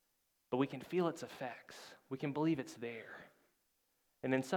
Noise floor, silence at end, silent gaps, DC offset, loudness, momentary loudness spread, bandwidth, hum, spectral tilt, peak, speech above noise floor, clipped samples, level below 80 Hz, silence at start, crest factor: -81 dBFS; 0 s; none; under 0.1%; -40 LUFS; 16 LU; 18.5 kHz; none; -6 dB/octave; -20 dBFS; 41 dB; under 0.1%; -84 dBFS; 0.5 s; 20 dB